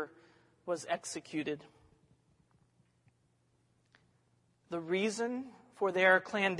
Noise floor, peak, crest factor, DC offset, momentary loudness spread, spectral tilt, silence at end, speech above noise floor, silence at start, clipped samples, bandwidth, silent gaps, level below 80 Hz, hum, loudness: -74 dBFS; -12 dBFS; 24 dB; under 0.1%; 18 LU; -4 dB/octave; 0 s; 40 dB; 0 s; under 0.1%; 11.5 kHz; none; -82 dBFS; none; -33 LUFS